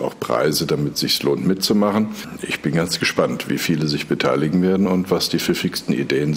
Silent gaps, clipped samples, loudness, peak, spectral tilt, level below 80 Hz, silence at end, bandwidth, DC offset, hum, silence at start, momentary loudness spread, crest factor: none; under 0.1%; -19 LUFS; -6 dBFS; -5 dB/octave; -54 dBFS; 0 s; 16 kHz; under 0.1%; none; 0 s; 5 LU; 14 dB